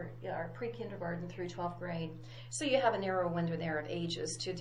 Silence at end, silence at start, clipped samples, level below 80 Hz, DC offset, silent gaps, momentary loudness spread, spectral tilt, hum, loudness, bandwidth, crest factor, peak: 0 s; 0 s; under 0.1%; -66 dBFS; under 0.1%; none; 11 LU; -4.5 dB/octave; none; -37 LUFS; 11.5 kHz; 20 dB; -16 dBFS